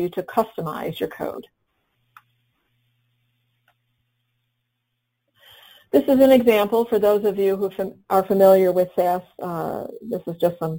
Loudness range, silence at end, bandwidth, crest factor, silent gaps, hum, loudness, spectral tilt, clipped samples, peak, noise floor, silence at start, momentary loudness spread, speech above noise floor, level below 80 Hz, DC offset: 16 LU; 0 s; 17 kHz; 18 dB; none; none; -20 LUFS; -6.5 dB/octave; under 0.1%; -4 dBFS; -76 dBFS; 0 s; 16 LU; 57 dB; -60 dBFS; under 0.1%